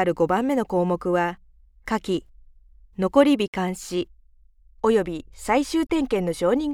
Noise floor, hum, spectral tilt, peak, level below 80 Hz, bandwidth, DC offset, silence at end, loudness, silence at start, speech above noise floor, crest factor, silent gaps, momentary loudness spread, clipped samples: -54 dBFS; none; -6 dB/octave; -4 dBFS; -48 dBFS; 16 kHz; under 0.1%; 0 s; -23 LUFS; 0 s; 31 dB; 20 dB; 3.48-3.53 s; 11 LU; under 0.1%